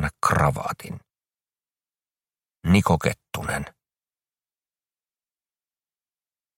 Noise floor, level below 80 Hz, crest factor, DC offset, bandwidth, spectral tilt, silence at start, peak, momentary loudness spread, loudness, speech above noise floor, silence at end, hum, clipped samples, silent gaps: under -90 dBFS; -44 dBFS; 24 dB; under 0.1%; 16.5 kHz; -6 dB/octave; 0 s; -4 dBFS; 18 LU; -23 LUFS; over 66 dB; 2.9 s; none; under 0.1%; none